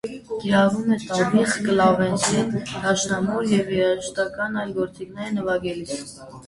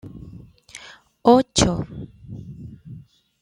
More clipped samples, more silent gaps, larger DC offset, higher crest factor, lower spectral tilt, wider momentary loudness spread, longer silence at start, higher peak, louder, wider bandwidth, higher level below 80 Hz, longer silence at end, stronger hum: neither; neither; neither; about the same, 18 dB vs 22 dB; about the same, -4.5 dB/octave vs -4.5 dB/octave; second, 11 LU vs 26 LU; about the same, 0.05 s vs 0.05 s; about the same, -4 dBFS vs -2 dBFS; second, -22 LUFS vs -18 LUFS; about the same, 11.5 kHz vs 12 kHz; second, -54 dBFS vs -42 dBFS; second, 0 s vs 0.45 s; neither